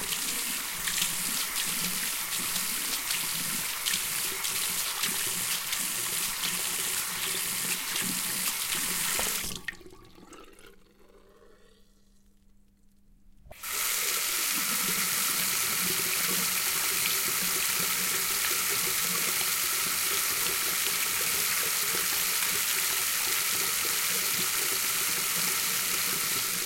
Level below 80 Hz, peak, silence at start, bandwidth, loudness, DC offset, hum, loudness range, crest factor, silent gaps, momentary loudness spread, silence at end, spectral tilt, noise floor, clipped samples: -60 dBFS; -10 dBFS; 0 s; 16.5 kHz; -26 LUFS; under 0.1%; none; 6 LU; 20 dB; none; 3 LU; 0 s; 0.5 dB/octave; -59 dBFS; under 0.1%